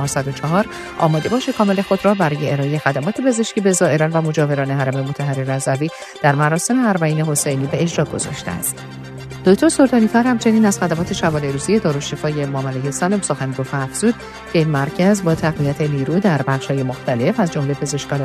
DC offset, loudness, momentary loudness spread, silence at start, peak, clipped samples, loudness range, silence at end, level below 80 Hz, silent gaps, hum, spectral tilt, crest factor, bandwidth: under 0.1%; -18 LUFS; 7 LU; 0 s; 0 dBFS; under 0.1%; 3 LU; 0 s; -48 dBFS; none; none; -5.5 dB/octave; 18 dB; 14 kHz